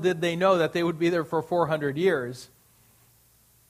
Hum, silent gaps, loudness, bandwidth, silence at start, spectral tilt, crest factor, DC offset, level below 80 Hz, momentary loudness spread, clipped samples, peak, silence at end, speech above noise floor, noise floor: none; none; -25 LUFS; 15.5 kHz; 0 s; -6 dB/octave; 18 dB; under 0.1%; -66 dBFS; 7 LU; under 0.1%; -8 dBFS; 1.25 s; 36 dB; -61 dBFS